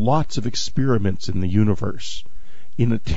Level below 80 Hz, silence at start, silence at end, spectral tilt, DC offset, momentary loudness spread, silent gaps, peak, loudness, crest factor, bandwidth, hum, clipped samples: -38 dBFS; 0 s; 0 s; -6.5 dB/octave; 10%; 13 LU; none; -4 dBFS; -22 LUFS; 16 dB; 8 kHz; none; under 0.1%